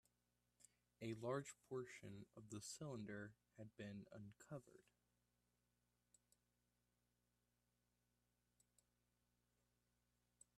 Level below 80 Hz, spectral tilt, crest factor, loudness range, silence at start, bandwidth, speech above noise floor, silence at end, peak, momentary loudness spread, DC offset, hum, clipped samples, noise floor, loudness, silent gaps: -88 dBFS; -5 dB/octave; 24 dB; 12 LU; 0.6 s; 13 kHz; 34 dB; 5.75 s; -34 dBFS; 13 LU; under 0.1%; 60 Hz at -80 dBFS; under 0.1%; -88 dBFS; -55 LUFS; none